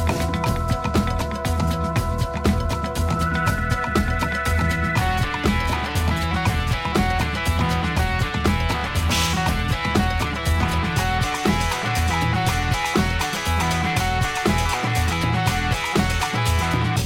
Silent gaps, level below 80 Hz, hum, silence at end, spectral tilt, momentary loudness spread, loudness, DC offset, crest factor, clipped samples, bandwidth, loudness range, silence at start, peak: none; -28 dBFS; none; 0 s; -5 dB/octave; 2 LU; -22 LUFS; under 0.1%; 18 dB; under 0.1%; 17 kHz; 1 LU; 0 s; -4 dBFS